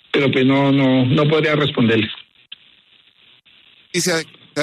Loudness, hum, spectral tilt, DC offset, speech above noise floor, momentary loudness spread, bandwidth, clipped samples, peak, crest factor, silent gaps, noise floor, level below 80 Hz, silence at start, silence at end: -17 LUFS; none; -5 dB/octave; under 0.1%; 37 dB; 10 LU; 13.5 kHz; under 0.1%; -4 dBFS; 14 dB; none; -53 dBFS; -58 dBFS; 0.15 s; 0 s